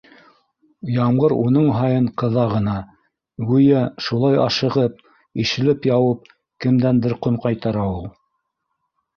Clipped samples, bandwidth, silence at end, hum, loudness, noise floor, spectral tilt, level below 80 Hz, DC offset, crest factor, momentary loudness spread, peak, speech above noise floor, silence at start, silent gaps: under 0.1%; 6.8 kHz; 1.05 s; none; -19 LUFS; -75 dBFS; -7.5 dB/octave; -48 dBFS; under 0.1%; 16 dB; 9 LU; -4 dBFS; 57 dB; 0.85 s; none